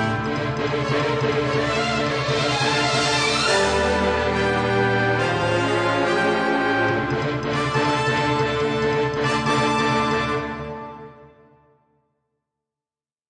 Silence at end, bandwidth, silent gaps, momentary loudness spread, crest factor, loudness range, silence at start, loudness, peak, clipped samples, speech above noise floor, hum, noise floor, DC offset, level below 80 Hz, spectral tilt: 2.05 s; 10 kHz; none; 5 LU; 16 dB; 5 LU; 0 s; -21 LUFS; -6 dBFS; under 0.1%; over 69 dB; none; under -90 dBFS; under 0.1%; -44 dBFS; -4.5 dB/octave